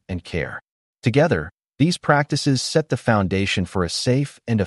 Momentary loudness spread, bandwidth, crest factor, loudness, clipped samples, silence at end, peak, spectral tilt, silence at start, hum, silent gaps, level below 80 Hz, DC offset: 9 LU; 11.5 kHz; 18 dB; -21 LUFS; under 0.1%; 0 s; -4 dBFS; -5.5 dB/octave; 0.1 s; none; 0.71-0.94 s; -46 dBFS; under 0.1%